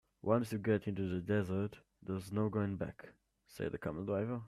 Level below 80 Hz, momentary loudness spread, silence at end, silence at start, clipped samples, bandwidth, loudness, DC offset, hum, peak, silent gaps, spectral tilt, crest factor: -66 dBFS; 9 LU; 0 s; 0.25 s; under 0.1%; 14 kHz; -38 LUFS; under 0.1%; none; -18 dBFS; none; -8 dB/octave; 20 dB